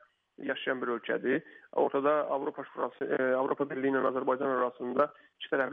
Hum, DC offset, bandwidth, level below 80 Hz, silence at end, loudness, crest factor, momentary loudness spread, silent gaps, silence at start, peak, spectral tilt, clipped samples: none; under 0.1%; 4.1 kHz; -84 dBFS; 0 s; -31 LUFS; 18 dB; 8 LU; none; 0.4 s; -14 dBFS; -3 dB/octave; under 0.1%